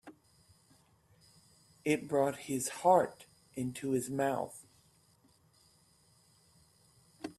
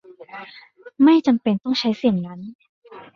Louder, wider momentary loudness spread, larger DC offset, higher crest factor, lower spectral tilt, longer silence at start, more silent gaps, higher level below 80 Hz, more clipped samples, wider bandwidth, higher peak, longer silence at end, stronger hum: second, -33 LUFS vs -19 LUFS; second, 16 LU vs 24 LU; neither; first, 24 dB vs 16 dB; second, -5 dB/octave vs -7 dB/octave; second, 0.05 s vs 0.35 s; second, none vs 2.55-2.59 s, 2.69-2.82 s; second, -74 dBFS vs -62 dBFS; neither; first, 14.5 kHz vs 7 kHz; second, -14 dBFS vs -6 dBFS; about the same, 0.05 s vs 0.15 s; neither